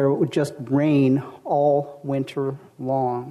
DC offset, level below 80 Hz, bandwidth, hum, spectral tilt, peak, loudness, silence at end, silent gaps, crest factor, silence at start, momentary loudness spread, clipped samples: under 0.1%; -64 dBFS; 13 kHz; none; -8 dB/octave; -10 dBFS; -22 LUFS; 0 s; none; 12 dB; 0 s; 9 LU; under 0.1%